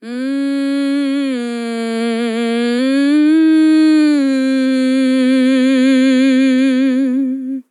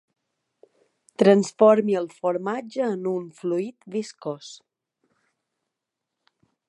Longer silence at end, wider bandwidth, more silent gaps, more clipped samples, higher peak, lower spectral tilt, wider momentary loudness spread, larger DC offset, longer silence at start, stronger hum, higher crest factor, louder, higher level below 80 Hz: second, 0.1 s vs 2.15 s; about the same, 11.5 kHz vs 11 kHz; neither; neither; about the same, -4 dBFS vs -4 dBFS; second, -4.5 dB/octave vs -6.5 dB/octave; second, 9 LU vs 17 LU; neither; second, 0 s vs 1.2 s; neither; second, 8 dB vs 22 dB; first, -14 LUFS vs -23 LUFS; second, under -90 dBFS vs -76 dBFS